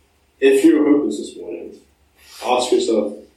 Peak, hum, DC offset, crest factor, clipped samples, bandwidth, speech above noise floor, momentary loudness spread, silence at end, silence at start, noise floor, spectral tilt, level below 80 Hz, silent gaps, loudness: -2 dBFS; none; under 0.1%; 16 dB; under 0.1%; 13.5 kHz; 30 dB; 19 LU; 0.15 s; 0.4 s; -46 dBFS; -4 dB/octave; -60 dBFS; none; -17 LUFS